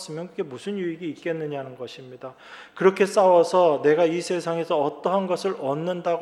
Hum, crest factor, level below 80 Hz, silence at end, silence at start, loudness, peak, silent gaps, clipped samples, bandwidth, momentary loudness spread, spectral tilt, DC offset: none; 20 dB; -76 dBFS; 0 s; 0 s; -23 LUFS; -4 dBFS; none; under 0.1%; 12.5 kHz; 20 LU; -5.5 dB/octave; under 0.1%